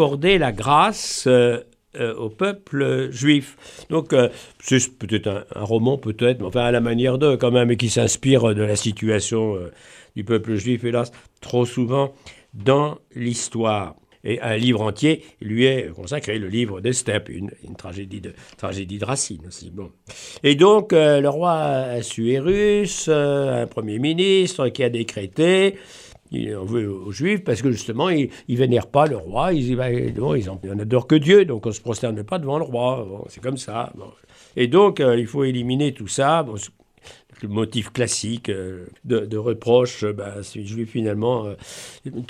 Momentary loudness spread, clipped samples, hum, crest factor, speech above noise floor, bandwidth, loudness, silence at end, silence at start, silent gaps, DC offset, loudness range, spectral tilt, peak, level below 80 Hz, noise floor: 16 LU; under 0.1%; none; 20 dB; 28 dB; 13.5 kHz; -20 LUFS; 0.05 s; 0 s; none; under 0.1%; 5 LU; -5 dB/octave; -2 dBFS; -50 dBFS; -48 dBFS